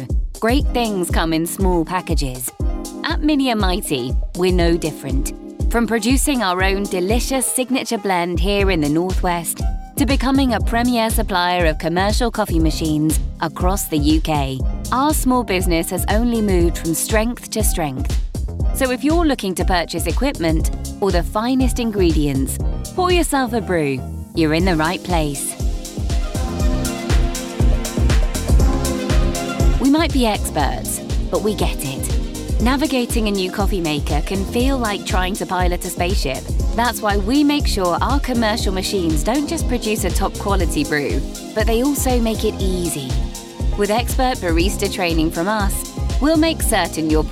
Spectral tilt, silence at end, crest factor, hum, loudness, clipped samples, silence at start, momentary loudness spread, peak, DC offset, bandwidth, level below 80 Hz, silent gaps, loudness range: -5 dB/octave; 0 s; 16 dB; none; -19 LUFS; under 0.1%; 0 s; 7 LU; -2 dBFS; under 0.1%; 16.5 kHz; -22 dBFS; none; 2 LU